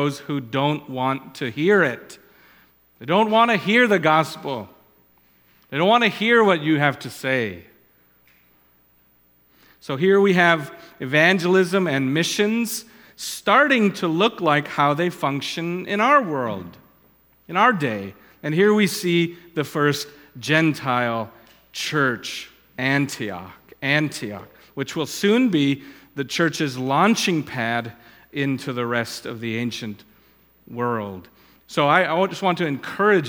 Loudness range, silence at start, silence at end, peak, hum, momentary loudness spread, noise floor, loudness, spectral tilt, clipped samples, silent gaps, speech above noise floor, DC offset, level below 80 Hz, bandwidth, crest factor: 6 LU; 0 s; 0 s; 0 dBFS; none; 16 LU; -59 dBFS; -20 LUFS; -5 dB/octave; under 0.1%; none; 38 dB; under 0.1%; -66 dBFS; 19 kHz; 20 dB